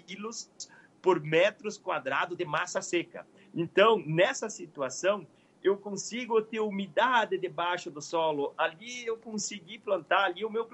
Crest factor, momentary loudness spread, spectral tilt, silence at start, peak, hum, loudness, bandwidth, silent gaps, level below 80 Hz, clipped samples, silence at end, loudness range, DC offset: 20 dB; 13 LU; -3.5 dB/octave; 0.1 s; -10 dBFS; none; -30 LUFS; 8.6 kHz; none; -82 dBFS; under 0.1%; 0.05 s; 2 LU; under 0.1%